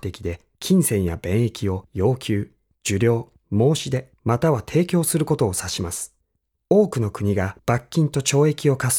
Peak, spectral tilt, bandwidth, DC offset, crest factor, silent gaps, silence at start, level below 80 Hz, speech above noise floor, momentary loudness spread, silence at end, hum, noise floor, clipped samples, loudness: -4 dBFS; -5.5 dB/octave; 18.5 kHz; under 0.1%; 16 dB; none; 0.05 s; -48 dBFS; 52 dB; 10 LU; 0 s; none; -73 dBFS; under 0.1%; -22 LUFS